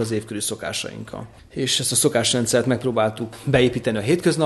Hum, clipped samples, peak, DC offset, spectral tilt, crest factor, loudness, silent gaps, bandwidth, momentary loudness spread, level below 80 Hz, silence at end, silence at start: none; under 0.1%; -4 dBFS; under 0.1%; -4 dB/octave; 18 dB; -21 LUFS; none; 12.5 kHz; 13 LU; -50 dBFS; 0 s; 0 s